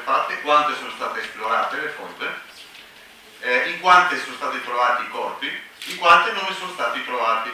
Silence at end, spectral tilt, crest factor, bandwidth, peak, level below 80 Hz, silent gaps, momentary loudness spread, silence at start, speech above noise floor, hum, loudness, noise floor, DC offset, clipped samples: 0 s; -2 dB/octave; 22 dB; 16 kHz; 0 dBFS; -66 dBFS; none; 15 LU; 0 s; 25 dB; none; -20 LUFS; -46 dBFS; under 0.1%; under 0.1%